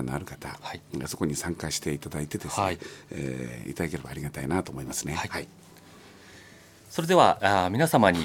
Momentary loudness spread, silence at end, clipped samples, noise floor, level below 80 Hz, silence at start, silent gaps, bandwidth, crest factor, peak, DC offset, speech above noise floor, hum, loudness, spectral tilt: 17 LU; 0 s; under 0.1%; -51 dBFS; -52 dBFS; 0 s; none; 17 kHz; 24 dB; -4 dBFS; under 0.1%; 24 dB; none; -28 LUFS; -4.5 dB/octave